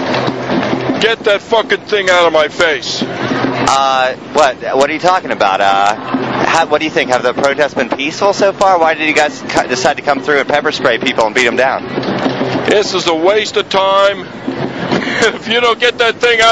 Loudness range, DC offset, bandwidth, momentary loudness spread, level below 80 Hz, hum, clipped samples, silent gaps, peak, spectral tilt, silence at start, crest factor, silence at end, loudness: 1 LU; 0.2%; 11 kHz; 6 LU; -48 dBFS; none; under 0.1%; none; 0 dBFS; -3.5 dB/octave; 0 s; 12 dB; 0 s; -12 LUFS